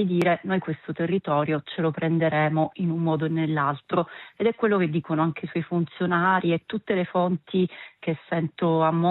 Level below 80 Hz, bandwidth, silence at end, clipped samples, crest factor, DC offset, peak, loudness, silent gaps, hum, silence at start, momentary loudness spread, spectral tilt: -68 dBFS; 5.8 kHz; 0 s; under 0.1%; 16 dB; under 0.1%; -8 dBFS; -25 LUFS; none; none; 0 s; 6 LU; -9 dB/octave